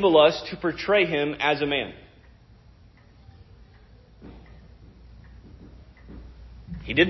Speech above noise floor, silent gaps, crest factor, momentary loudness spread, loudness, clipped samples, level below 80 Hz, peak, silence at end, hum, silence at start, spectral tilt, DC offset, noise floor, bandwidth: 31 dB; none; 22 dB; 27 LU; -23 LUFS; under 0.1%; -48 dBFS; -6 dBFS; 0 s; none; 0 s; -6 dB/octave; under 0.1%; -53 dBFS; 6 kHz